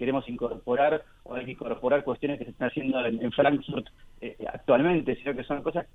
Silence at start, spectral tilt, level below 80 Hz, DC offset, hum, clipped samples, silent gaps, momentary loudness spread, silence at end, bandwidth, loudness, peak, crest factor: 0 s; -8.5 dB/octave; -54 dBFS; under 0.1%; none; under 0.1%; none; 13 LU; 0.1 s; 4 kHz; -28 LUFS; -10 dBFS; 18 dB